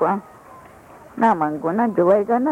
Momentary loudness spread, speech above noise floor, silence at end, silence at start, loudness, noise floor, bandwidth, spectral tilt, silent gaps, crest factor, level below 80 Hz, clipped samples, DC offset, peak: 8 LU; 26 dB; 0 s; 0 s; -19 LUFS; -44 dBFS; 13.5 kHz; -8.5 dB/octave; none; 14 dB; -60 dBFS; under 0.1%; under 0.1%; -6 dBFS